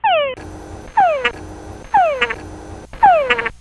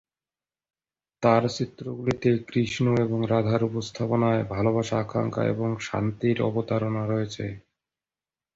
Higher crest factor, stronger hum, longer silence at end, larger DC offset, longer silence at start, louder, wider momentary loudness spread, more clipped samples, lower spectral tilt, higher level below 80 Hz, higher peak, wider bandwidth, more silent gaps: about the same, 16 dB vs 20 dB; neither; second, 0.05 s vs 0.95 s; neither; second, 0.05 s vs 1.2 s; first, -16 LUFS vs -26 LUFS; first, 21 LU vs 7 LU; neither; second, -4 dB/octave vs -7 dB/octave; first, -40 dBFS vs -56 dBFS; first, 0 dBFS vs -6 dBFS; first, 12 kHz vs 7.8 kHz; neither